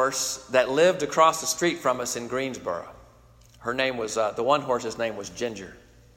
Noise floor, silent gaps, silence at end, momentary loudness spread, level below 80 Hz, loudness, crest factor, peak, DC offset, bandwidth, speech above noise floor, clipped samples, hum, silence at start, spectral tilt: -54 dBFS; none; 0.4 s; 12 LU; -58 dBFS; -25 LUFS; 22 dB; -4 dBFS; under 0.1%; 16 kHz; 29 dB; under 0.1%; none; 0 s; -3 dB/octave